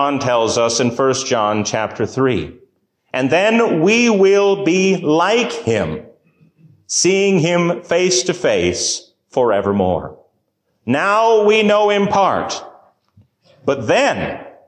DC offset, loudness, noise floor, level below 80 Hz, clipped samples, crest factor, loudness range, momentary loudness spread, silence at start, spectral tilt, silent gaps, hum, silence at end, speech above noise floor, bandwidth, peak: under 0.1%; -15 LUFS; -67 dBFS; -48 dBFS; under 0.1%; 12 dB; 3 LU; 11 LU; 0 s; -4 dB/octave; none; none; 0.2 s; 52 dB; 10.5 kHz; -4 dBFS